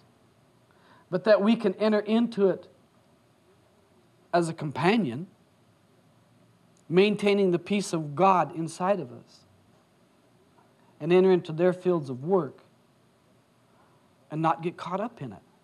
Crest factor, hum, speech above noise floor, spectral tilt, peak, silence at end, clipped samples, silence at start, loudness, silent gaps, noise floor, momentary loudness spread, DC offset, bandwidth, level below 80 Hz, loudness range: 22 dB; none; 38 dB; -6.5 dB/octave; -6 dBFS; 0.25 s; under 0.1%; 1.1 s; -26 LUFS; none; -63 dBFS; 14 LU; under 0.1%; 11.5 kHz; -78 dBFS; 5 LU